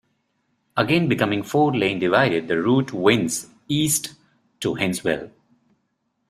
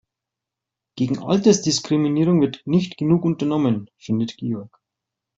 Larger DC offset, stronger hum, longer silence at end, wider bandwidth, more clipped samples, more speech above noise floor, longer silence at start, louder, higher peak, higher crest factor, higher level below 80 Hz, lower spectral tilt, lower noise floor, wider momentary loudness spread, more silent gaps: neither; neither; first, 1 s vs 0.7 s; first, 15.5 kHz vs 8 kHz; neither; second, 52 dB vs 66 dB; second, 0.75 s vs 0.95 s; about the same, -21 LUFS vs -20 LUFS; about the same, -4 dBFS vs -4 dBFS; about the same, 20 dB vs 18 dB; about the same, -58 dBFS vs -60 dBFS; second, -4.5 dB/octave vs -6 dB/octave; second, -72 dBFS vs -85 dBFS; about the same, 9 LU vs 10 LU; neither